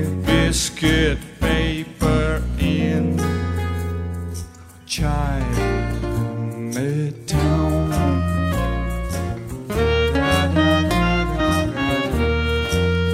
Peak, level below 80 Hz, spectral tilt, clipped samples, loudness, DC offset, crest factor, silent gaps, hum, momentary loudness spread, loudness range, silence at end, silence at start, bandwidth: -4 dBFS; -28 dBFS; -5.5 dB/octave; under 0.1%; -21 LUFS; under 0.1%; 16 dB; none; none; 8 LU; 5 LU; 0 s; 0 s; 16 kHz